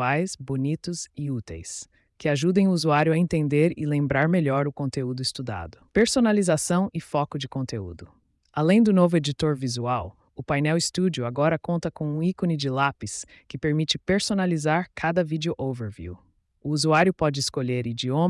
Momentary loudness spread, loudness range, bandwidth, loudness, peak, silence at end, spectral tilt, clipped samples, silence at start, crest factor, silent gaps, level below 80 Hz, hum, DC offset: 14 LU; 3 LU; 12 kHz; -24 LUFS; -10 dBFS; 0 s; -5.5 dB/octave; under 0.1%; 0 s; 16 dB; none; -54 dBFS; none; under 0.1%